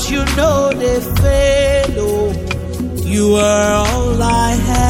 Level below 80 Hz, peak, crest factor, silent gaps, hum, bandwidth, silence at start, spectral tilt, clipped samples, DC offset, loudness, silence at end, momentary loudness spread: -22 dBFS; -2 dBFS; 12 dB; none; none; 17 kHz; 0 s; -5 dB/octave; under 0.1%; under 0.1%; -14 LUFS; 0 s; 8 LU